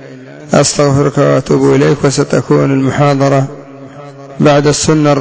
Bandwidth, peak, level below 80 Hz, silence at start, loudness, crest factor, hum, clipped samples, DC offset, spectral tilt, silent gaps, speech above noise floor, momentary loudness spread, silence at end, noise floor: 8 kHz; 0 dBFS; -40 dBFS; 0 s; -10 LUFS; 10 dB; none; under 0.1%; under 0.1%; -5.5 dB/octave; none; 21 dB; 17 LU; 0 s; -30 dBFS